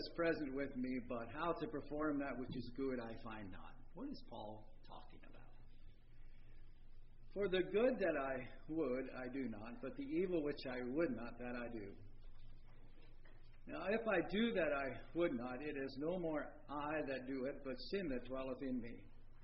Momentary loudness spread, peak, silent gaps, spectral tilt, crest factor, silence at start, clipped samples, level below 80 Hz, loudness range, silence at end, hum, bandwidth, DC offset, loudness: 17 LU; -24 dBFS; none; -4.5 dB/octave; 18 dB; 0 s; under 0.1%; -56 dBFS; 11 LU; 0 s; none; 5.6 kHz; under 0.1%; -43 LUFS